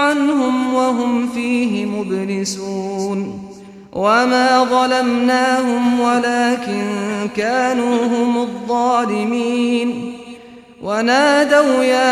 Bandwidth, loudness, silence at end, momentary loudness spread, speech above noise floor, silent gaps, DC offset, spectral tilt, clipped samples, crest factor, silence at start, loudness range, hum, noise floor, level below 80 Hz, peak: 13.5 kHz; -16 LUFS; 0 s; 10 LU; 22 dB; none; under 0.1%; -4.5 dB/octave; under 0.1%; 14 dB; 0 s; 4 LU; none; -38 dBFS; -58 dBFS; -2 dBFS